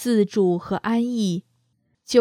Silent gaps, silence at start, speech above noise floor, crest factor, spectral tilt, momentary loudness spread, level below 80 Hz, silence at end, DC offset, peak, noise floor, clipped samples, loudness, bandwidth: none; 0 s; 47 dB; 18 dB; -6 dB/octave; 6 LU; -62 dBFS; 0 s; under 0.1%; -4 dBFS; -68 dBFS; under 0.1%; -22 LUFS; 14.5 kHz